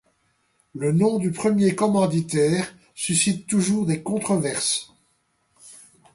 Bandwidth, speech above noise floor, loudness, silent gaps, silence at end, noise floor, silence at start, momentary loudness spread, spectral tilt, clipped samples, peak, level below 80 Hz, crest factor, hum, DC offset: 11.5 kHz; 46 dB; -22 LUFS; none; 0.4 s; -68 dBFS; 0.75 s; 7 LU; -5 dB/octave; under 0.1%; -8 dBFS; -60 dBFS; 16 dB; none; under 0.1%